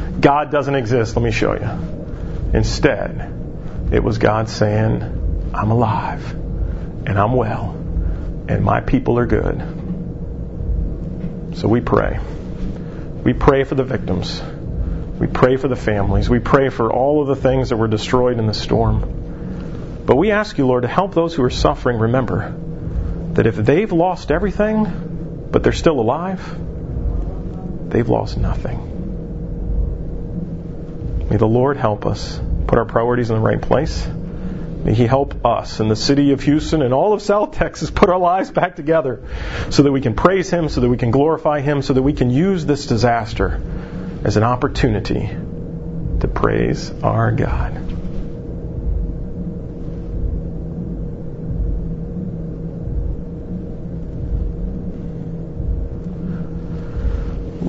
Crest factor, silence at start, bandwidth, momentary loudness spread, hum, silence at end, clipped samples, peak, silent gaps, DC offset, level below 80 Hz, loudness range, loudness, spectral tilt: 18 dB; 0 s; 8 kHz; 13 LU; none; 0 s; under 0.1%; 0 dBFS; none; under 0.1%; -26 dBFS; 10 LU; -19 LUFS; -7 dB/octave